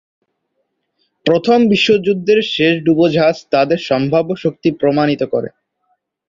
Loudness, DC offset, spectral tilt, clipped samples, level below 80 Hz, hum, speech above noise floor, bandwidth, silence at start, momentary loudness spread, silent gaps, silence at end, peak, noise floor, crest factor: -14 LUFS; under 0.1%; -6.5 dB/octave; under 0.1%; -56 dBFS; none; 56 dB; 7.6 kHz; 1.25 s; 7 LU; none; 0.8 s; -2 dBFS; -69 dBFS; 14 dB